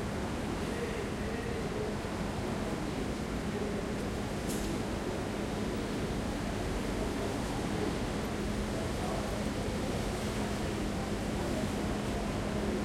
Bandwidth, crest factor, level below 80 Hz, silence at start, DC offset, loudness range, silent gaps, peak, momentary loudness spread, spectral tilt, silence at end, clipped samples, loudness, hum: 16.5 kHz; 14 dB; -44 dBFS; 0 s; under 0.1%; 1 LU; none; -20 dBFS; 2 LU; -5.5 dB/octave; 0 s; under 0.1%; -35 LUFS; none